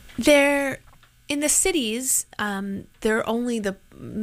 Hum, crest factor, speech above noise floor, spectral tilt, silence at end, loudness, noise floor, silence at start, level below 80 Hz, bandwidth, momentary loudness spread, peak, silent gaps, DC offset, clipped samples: none; 18 dB; 30 dB; -2.5 dB/octave; 0 s; -22 LUFS; -52 dBFS; 0.05 s; -48 dBFS; 16 kHz; 15 LU; -6 dBFS; none; under 0.1%; under 0.1%